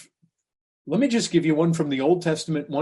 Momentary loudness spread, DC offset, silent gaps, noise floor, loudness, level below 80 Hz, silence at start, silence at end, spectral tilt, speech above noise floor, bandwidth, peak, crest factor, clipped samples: 6 LU; under 0.1%; none; -64 dBFS; -23 LUFS; -66 dBFS; 0.85 s; 0 s; -6 dB/octave; 42 dB; 11.5 kHz; -8 dBFS; 16 dB; under 0.1%